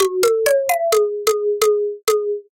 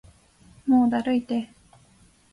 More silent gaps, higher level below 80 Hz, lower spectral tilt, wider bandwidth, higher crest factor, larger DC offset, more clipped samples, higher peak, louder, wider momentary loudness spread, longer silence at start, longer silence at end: neither; about the same, -64 dBFS vs -60 dBFS; second, -1 dB/octave vs -6.5 dB/octave; first, 17 kHz vs 11 kHz; about the same, 14 dB vs 16 dB; neither; neither; first, -4 dBFS vs -10 dBFS; first, -18 LUFS vs -24 LUFS; second, 3 LU vs 13 LU; second, 0 s vs 0.65 s; second, 0.1 s vs 0.9 s